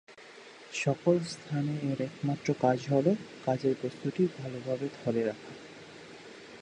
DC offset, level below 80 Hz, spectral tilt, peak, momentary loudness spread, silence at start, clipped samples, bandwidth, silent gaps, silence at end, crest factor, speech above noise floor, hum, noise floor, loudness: under 0.1%; -72 dBFS; -6.5 dB/octave; -12 dBFS; 20 LU; 0.1 s; under 0.1%; 10 kHz; none; 0 s; 20 dB; 21 dB; none; -51 dBFS; -31 LUFS